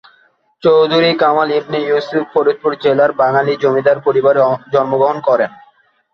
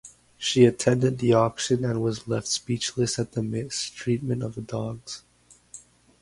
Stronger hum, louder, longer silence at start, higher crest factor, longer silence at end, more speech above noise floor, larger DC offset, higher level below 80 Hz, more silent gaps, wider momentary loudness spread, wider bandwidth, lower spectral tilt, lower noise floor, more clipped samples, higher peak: second, none vs 60 Hz at -45 dBFS; first, -14 LUFS vs -25 LUFS; first, 0.65 s vs 0.05 s; second, 14 dB vs 22 dB; first, 0.65 s vs 0.45 s; first, 41 dB vs 28 dB; neither; about the same, -60 dBFS vs -56 dBFS; neither; second, 5 LU vs 19 LU; second, 6.6 kHz vs 11.5 kHz; first, -7 dB/octave vs -5 dB/octave; about the same, -54 dBFS vs -52 dBFS; neither; first, 0 dBFS vs -4 dBFS